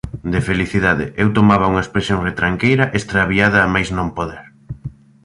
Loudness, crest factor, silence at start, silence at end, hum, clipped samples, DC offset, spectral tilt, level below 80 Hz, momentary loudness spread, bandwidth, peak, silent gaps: -16 LUFS; 16 dB; 0.05 s; 0.35 s; none; under 0.1%; under 0.1%; -6.5 dB/octave; -36 dBFS; 16 LU; 11 kHz; -2 dBFS; none